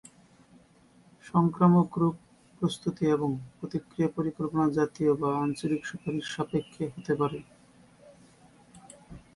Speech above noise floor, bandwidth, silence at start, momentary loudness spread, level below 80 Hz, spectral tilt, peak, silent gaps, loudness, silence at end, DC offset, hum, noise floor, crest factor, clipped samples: 32 dB; 11.5 kHz; 1.25 s; 13 LU; -62 dBFS; -7.5 dB/octave; -10 dBFS; none; -29 LUFS; 0.15 s; under 0.1%; none; -59 dBFS; 20 dB; under 0.1%